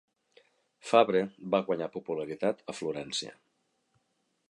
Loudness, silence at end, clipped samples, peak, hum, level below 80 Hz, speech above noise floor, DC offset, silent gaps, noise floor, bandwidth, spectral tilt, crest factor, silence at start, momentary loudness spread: -30 LUFS; 1.2 s; under 0.1%; -8 dBFS; none; -76 dBFS; 47 dB; under 0.1%; none; -77 dBFS; 11.5 kHz; -4.5 dB/octave; 24 dB; 0.85 s; 12 LU